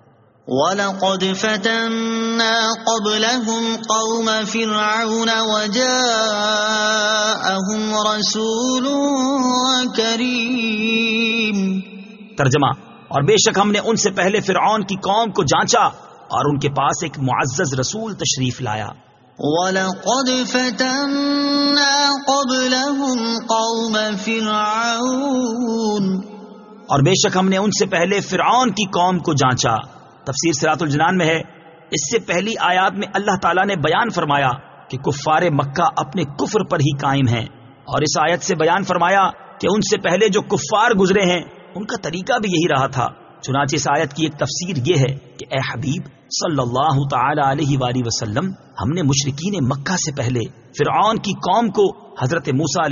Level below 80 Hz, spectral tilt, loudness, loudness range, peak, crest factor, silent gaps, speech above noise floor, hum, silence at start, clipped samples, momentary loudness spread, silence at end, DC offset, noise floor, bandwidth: -52 dBFS; -3.5 dB/octave; -18 LUFS; 3 LU; -2 dBFS; 16 dB; none; 21 dB; none; 0.45 s; under 0.1%; 8 LU; 0 s; under 0.1%; -39 dBFS; 7.4 kHz